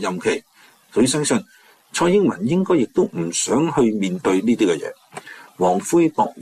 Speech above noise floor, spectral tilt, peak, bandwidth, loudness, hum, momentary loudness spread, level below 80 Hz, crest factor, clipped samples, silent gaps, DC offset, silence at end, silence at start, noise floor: 20 dB; -5 dB/octave; -6 dBFS; 14.5 kHz; -19 LUFS; none; 10 LU; -58 dBFS; 14 dB; under 0.1%; none; under 0.1%; 0 s; 0 s; -39 dBFS